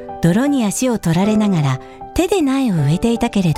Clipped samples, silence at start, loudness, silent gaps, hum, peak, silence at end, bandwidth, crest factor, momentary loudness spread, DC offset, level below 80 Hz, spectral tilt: under 0.1%; 0 s; -17 LUFS; none; none; -2 dBFS; 0 s; 15.5 kHz; 14 dB; 5 LU; under 0.1%; -38 dBFS; -6 dB/octave